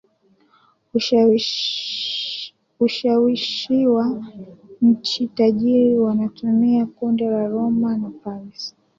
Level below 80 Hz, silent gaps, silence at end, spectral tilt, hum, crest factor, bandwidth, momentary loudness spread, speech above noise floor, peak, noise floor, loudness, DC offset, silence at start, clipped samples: -64 dBFS; none; 0.3 s; -5.5 dB/octave; none; 14 dB; 7.4 kHz; 15 LU; 41 dB; -6 dBFS; -59 dBFS; -19 LUFS; under 0.1%; 0.95 s; under 0.1%